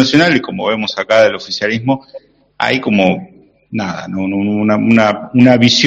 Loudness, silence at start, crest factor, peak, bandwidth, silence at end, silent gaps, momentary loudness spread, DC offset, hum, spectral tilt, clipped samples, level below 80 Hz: -13 LUFS; 0 s; 14 dB; 0 dBFS; 8 kHz; 0 s; none; 11 LU; under 0.1%; none; -5 dB/octave; 0.2%; -52 dBFS